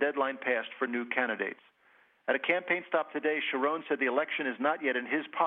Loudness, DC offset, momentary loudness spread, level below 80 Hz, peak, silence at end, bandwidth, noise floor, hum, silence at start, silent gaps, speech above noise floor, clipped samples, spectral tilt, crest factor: -31 LUFS; under 0.1%; 5 LU; under -90 dBFS; -12 dBFS; 0 s; 4.2 kHz; -65 dBFS; none; 0 s; none; 34 dB; under 0.1%; -7 dB/octave; 20 dB